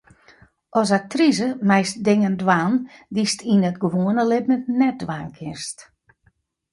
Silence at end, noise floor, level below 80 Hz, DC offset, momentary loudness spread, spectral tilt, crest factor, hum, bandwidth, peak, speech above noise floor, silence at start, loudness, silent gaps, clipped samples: 0.9 s; -64 dBFS; -60 dBFS; under 0.1%; 12 LU; -5.5 dB/octave; 18 dB; none; 11.5 kHz; -2 dBFS; 44 dB; 0.75 s; -20 LUFS; none; under 0.1%